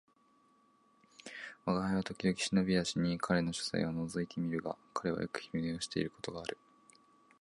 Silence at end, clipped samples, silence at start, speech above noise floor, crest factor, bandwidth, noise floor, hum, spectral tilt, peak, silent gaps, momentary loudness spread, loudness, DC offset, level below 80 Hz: 0.85 s; under 0.1%; 1.2 s; 34 dB; 20 dB; 11.5 kHz; -70 dBFS; none; -5 dB/octave; -16 dBFS; none; 12 LU; -36 LUFS; under 0.1%; -62 dBFS